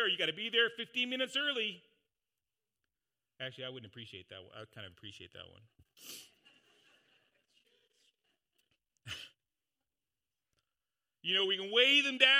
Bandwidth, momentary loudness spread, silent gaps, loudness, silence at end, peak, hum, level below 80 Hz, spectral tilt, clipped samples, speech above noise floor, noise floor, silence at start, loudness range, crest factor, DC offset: 15.5 kHz; 25 LU; none; -31 LUFS; 0 s; -8 dBFS; none; -84 dBFS; -2 dB/octave; under 0.1%; over 56 dB; under -90 dBFS; 0 s; 21 LU; 28 dB; under 0.1%